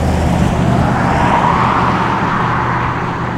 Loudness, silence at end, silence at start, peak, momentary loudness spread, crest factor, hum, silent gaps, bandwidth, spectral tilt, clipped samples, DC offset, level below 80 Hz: -14 LUFS; 0 s; 0 s; 0 dBFS; 4 LU; 12 dB; none; none; 13.5 kHz; -6.5 dB/octave; under 0.1%; under 0.1%; -28 dBFS